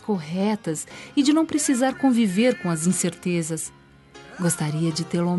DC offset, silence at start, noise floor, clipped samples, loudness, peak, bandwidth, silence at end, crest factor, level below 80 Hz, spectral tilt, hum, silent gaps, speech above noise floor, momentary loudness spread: under 0.1%; 0.05 s; -47 dBFS; under 0.1%; -23 LUFS; -8 dBFS; 12 kHz; 0 s; 14 dB; -62 dBFS; -5 dB/octave; none; none; 25 dB; 9 LU